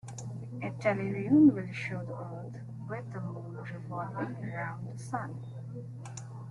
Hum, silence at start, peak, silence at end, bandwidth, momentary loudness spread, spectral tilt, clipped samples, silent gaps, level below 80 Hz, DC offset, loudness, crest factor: none; 0.05 s; -12 dBFS; 0 s; 11 kHz; 18 LU; -7.5 dB/octave; under 0.1%; none; -66 dBFS; under 0.1%; -33 LUFS; 20 dB